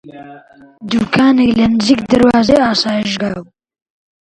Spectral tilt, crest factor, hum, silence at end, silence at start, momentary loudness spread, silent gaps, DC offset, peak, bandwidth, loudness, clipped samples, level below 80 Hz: -5.5 dB/octave; 14 dB; none; 0.8 s; 0.05 s; 10 LU; none; under 0.1%; 0 dBFS; 11 kHz; -12 LUFS; under 0.1%; -42 dBFS